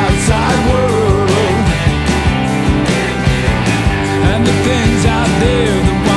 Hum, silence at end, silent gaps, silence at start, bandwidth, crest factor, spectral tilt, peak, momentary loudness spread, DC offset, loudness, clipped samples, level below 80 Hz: none; 0 s; none; 0 s; 12 kHz; 12 dB; -5.5 dB/octave; 0 dBFS; 2 LU; under 0.1%; -13 LUFS; under 0.1%; -22 dBFS